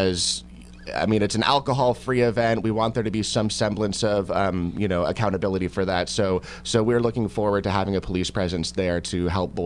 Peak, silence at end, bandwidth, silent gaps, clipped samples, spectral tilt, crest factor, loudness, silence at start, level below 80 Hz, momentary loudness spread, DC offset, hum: -4 dBFS; 0 s; 11.5 kHz; none; under 0.1%; -5 dB/octave; 18 dB; -23 LUFS; 0 s; -44 dBFS; 5 LU; under 0.1%; none